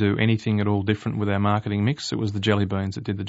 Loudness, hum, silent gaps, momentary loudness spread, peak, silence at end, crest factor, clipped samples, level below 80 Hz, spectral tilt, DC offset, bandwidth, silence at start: -24 LUFS; none; none; 5 LU; -4 dBFS; 0 s; 18 dB; under 0.1%; -56 dBFS; -6.5 dB/octave; under 0.1%; 8 kHz; 0 s